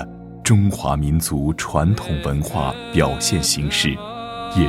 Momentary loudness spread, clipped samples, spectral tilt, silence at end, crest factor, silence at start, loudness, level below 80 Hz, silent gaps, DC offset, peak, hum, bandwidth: 8 LU; under 0.1%; -4.5 dB/octave; 0 s; 18 dB; 0 s; -20 LUFS; -32 dBFS; none; under 0.1%; 0 dBFS; none; 16 kHz